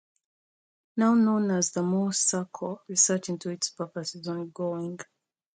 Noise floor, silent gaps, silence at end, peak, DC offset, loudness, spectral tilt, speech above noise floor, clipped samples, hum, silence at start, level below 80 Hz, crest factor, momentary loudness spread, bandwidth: under -90 dBFS; none; 0.55 s; -10 dBFS; under 0.1%; -27 LUFS; -4 dB/octave; over 63 dB; under 0.1%; none; 0.95 s; -76 dBFS; 18 dB; 13 LU; 9.6 kHz